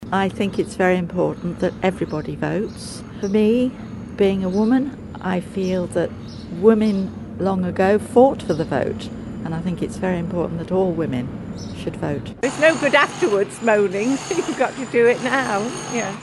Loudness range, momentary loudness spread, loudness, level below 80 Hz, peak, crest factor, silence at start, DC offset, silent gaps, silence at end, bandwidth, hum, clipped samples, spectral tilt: 5 LU; 13 LU; -20 LUFS; -46 dBFS; 0 dBFS; 20 dB; 0 s; under 0.1%; none; 0 s; 12 kHz; none; under 0.1%; -6 dB/octave